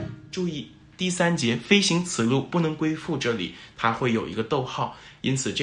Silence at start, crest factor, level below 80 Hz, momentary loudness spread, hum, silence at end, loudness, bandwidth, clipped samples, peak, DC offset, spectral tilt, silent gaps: 0 s; 22 dB; -58 dBFS; 11 LU; none; 0 s; -25 LUFS; 11.5 kHz; under 0.1%; -4 dBFS; under 0.1%; -4.5 dB/octave; none